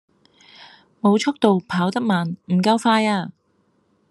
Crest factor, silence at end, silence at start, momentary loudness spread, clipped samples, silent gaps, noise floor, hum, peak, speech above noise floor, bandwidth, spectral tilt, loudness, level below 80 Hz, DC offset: 20 dB; 0.8 s; 0.6 s; 6 LU; under 0.1%; none; -64 dBFS; none; -2 dBFS; 45 dB; 12 kHz; -6 dB/octave; -20 LUFS; -68 dBFS; under 0.1%